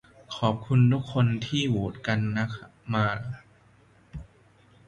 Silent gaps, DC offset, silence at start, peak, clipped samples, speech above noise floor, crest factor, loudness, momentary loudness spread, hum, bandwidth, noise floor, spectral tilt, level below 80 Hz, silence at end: none; under 0.1%; 0.3 s; -8 dBFS; under 0.1%; 33 dB; 20 dB; -26 LUFS; 21 LU; none; 8.2 kHz; -58 dBFS; -7 dB/octave; -54 dBFS; 0.65 s